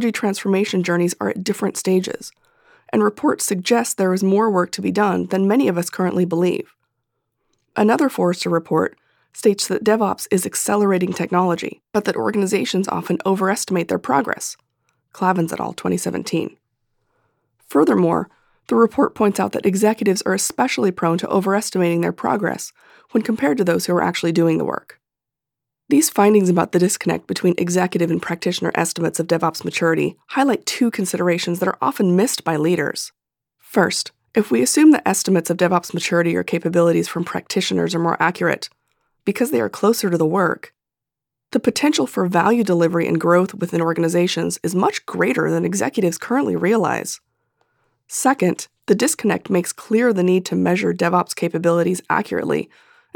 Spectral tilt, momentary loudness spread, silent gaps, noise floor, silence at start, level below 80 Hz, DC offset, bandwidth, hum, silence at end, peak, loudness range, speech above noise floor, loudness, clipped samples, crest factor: -5 dB/octave; 7 LU; none; -87 dBFS; 0 s; -66 dBFS; under 0.1%; 19.5 kHz; none; 0.5 s; -2 dBFS; 3 LU; 68 dB; -19 LUFS; under 0.1%; 16 dB